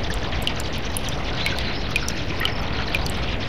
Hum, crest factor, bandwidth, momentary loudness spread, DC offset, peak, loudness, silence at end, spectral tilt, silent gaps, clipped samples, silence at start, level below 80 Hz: none; 22 dB; 16.5 kHz; 3 LU; 4%; -4 dBFS; -25 LUFS; 0 s; -4 dB/octave; none; under 0.1%; 0 s; -32 dBFS